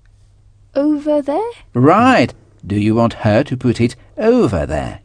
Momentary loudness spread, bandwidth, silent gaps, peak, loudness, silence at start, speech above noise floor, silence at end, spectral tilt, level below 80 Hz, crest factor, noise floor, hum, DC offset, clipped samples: 11 LU; 10 kHz; none; 0 dBFS; -15 LUFS; 0.75 s; 33 dB; 0.05 s; -7.5 dB/octave; -38 dBFS; 16 dB; -48 dBFS; none; under 0.1%; under 0.1%